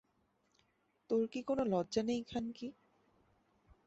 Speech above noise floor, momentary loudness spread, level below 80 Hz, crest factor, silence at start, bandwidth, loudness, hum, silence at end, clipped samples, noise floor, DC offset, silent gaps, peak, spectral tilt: 41 dB; 10 LU; -70 dBFS; 18 dB; 1.1 s; 8 kHz; -37 LUFS; none; 1.15 s; under 0.1%; -78 dBFS; under 0.1%; none; -22 dBFS; -5.5 dB/octave